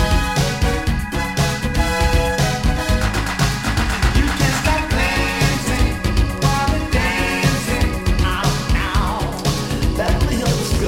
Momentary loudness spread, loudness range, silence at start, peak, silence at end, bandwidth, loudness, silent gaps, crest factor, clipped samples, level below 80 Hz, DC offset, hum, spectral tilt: 3 LU; 1 LU; 0 s; -2 dBFS; 0 s; 16.5 kHz; -18 LUFS; none; 14 dB; under 0.1%; -22 dBFS; under 0.1%; none; -4.5 dB/octave